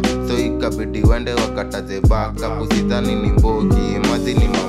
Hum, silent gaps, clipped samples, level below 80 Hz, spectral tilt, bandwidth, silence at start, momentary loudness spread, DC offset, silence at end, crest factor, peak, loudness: none; none; under 0.1%; -22 dBFS; -6.5 dB/octave; 14 kHz; 0 s; 6 LU; under 0.1%; 0 s; 14 dB; -2 dBFS; -18 LUFS